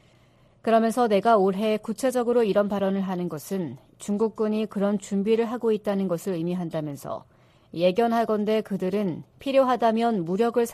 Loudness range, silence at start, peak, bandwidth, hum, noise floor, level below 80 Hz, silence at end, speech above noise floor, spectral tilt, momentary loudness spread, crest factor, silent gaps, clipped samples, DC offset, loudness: 3 LU; 0.65 s; -8 dBFS; 14.5 kHz; none; -58 dBFS; -66 dBFS; 0 s; 34 dB; -6.5 dB/octave; 11 LU; 16 dB; none; under 0.1%; under 0.1%; -24 LUFS